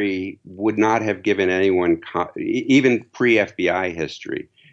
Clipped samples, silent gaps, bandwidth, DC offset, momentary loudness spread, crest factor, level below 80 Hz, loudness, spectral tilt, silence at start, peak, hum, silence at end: under 0.1%; none; 8 kHz; under 0.1%; 12 LU; 16 dB; -58 dBFS; -20 LUFS; -5.5 dB/octave; 0 s; -4 dBFS; none; 0.3 s